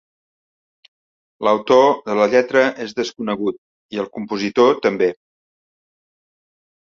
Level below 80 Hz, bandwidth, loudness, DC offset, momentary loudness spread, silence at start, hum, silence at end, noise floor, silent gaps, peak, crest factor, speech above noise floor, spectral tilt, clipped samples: -64 dBFS; 7.2 kHz; -18 LUFS; under 0.1%; 12 LU; 1.4 s; none; 1.75 s; under -90 dBFS; 3.58-3.89 s; -2 dBFS; 18 dB; over 73 dB; -5 dB/octave; under 0.1%